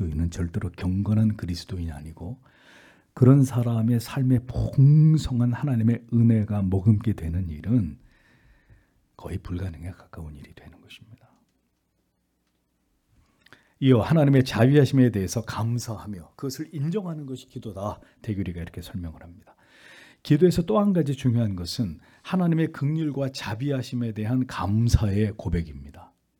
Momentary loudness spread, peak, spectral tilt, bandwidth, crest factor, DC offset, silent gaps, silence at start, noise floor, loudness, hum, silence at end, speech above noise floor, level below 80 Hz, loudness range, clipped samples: 18 LU; -4 dBFS; -7.5 dB/octave; 17 kHz; 20 dB; under 0.1%; none; 0 s; -72 dBFS; -24 LUFS; none; 0.35 s; 49 dB; -44 dBFS; 14 LU; under 0.1%